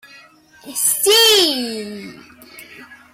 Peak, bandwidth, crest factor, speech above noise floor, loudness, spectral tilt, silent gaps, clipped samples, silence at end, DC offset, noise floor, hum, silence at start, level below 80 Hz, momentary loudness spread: -4 dBFS; 16.5 kHz; 16 dB; 30 dB; -13 LUFS; 0 dB/octave; none; under 0.1%; 0.2 s; under 0.1%; -46 dBFS; none; 0.65 s; -62 dBFS; 20 LU